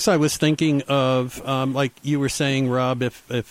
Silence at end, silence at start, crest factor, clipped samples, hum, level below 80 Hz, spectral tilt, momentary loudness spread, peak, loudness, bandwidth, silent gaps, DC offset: 0.05 s; 0 s; 14 dB; under 0.1%; none; -52 dBFS; -5 dB/octave; 6 LU; -8 dBFS; -22 LUFS; 16 kHz; none; under 0.1%